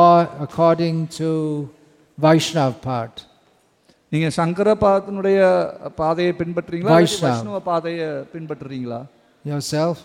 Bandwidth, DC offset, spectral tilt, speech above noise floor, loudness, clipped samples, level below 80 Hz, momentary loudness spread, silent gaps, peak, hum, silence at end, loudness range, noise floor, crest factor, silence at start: 16 kHz; under 0.1%; -6 dB/octave; 39 dB; -19 LUFS; under 0.1%; -54 dBFS; 15 LU; none; -2 dBFS; none; 0.05 s; 4 LU; -59 dBFS; 16 dB; 0 s